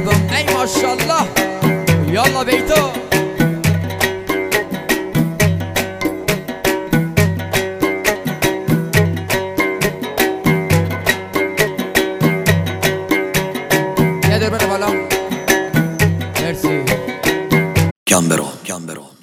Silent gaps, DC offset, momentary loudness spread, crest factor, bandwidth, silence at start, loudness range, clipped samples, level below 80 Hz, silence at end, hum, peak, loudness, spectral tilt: 17.91-18.06 s; under 0.1%; 5 LU; 16 dB; 16 kHz; 0 s; 2 LU; under 0.1%; -38 dBFS; 0.15 s; none; 0 dBFS; -16 LUFS; -4.5 dB/octave